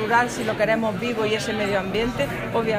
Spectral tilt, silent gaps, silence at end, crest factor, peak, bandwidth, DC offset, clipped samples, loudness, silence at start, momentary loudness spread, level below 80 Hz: -5 dB/octave; none; 0 s; 14 dB; -8 dBFS; 15.5 kHz; under 0.1%; under 0.1%; -23 LUFS; 0 s; 4 LU; -46 dBFS